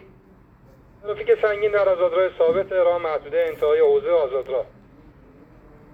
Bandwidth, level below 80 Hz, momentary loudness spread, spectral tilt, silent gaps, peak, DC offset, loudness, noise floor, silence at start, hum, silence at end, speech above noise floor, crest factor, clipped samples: 4.8 kHz; -54 dBFS; 10 LU; -6.5 dB/octave; none; -8 dBFS; under 0.1%; -21 LUFS; -51 dBFS; 1.05 s; none; 1.3 s; 31 dB; 14 dB; under 0.1%